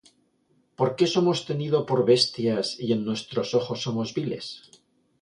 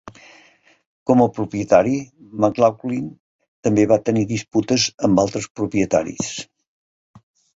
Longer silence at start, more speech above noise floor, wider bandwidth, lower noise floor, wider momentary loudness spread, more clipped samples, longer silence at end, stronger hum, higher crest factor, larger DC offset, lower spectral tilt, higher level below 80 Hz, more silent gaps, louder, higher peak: first, 0.8 s vs 0.05 s; first, 42 dB vs 35 dB; first, 11 kHz vs 8 kHz; first, -67 dBFS vs -54 dBFS; about the same, 10 LU vs 11 LU; neither; second, 0.65 s vs 1.15 s; neither; about the same, 18 dB vs 18 dB; neither; about the same, -5.5 dB/octave vs -5.5 dB/octave; second, -66 dBFS vs -52 dBFS; second, none vs 0.86-1.06 s, 3.20-3.39 s, 3.48-3.63 s, 4.94-4.98 s, 5.50-5.55 s; second, -25 LUFS vs -19 LUFS; second, -6 dBFS vs -2 dBFS